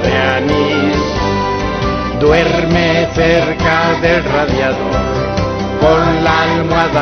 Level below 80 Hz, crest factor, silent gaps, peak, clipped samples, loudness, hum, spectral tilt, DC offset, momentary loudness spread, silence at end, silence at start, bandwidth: -26 dBFS; 12 dB; none; 0 dBFS; under 0.1%; -13 LUFS; none; -6 dB/octave; under 0.1%; 5 LU; 0 s; 0 s; 6.6 kHz